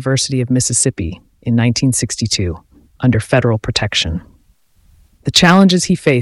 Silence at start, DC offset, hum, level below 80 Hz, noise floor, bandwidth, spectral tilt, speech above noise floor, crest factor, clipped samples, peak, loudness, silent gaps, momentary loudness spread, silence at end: 0 s; under 0.1%; none; -38 dBFS; -53 dBFS; 15.5 kHz; -4.5 dB/octave; 39 dB; 16 dB; under 0.1%; 0 dBFS; -14 LUFS; none; 15 LU; 0 s